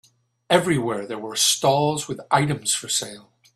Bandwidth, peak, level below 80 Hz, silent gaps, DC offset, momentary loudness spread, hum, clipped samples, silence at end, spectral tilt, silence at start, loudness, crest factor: 14 kHz; -4 dBFS; -58 dBFS; none; under 0.1%; 10 LU; none; under 0.1%; 0.35 s; -3 dB/octave; 0.5 s; -21 LUFS; 20 dB